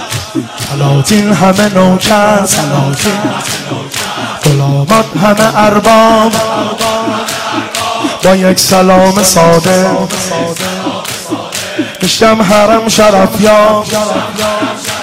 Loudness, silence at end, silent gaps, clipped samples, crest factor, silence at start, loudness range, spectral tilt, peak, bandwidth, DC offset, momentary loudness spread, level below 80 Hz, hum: -9 LUFS; 0 s; none; 0.2%; 8 dB; 0 s; 2 LU; -4.5 dB/octave; 0 dBFS; 16.5 kHz; under 0.1%; 10 LU; -38 dBFS; none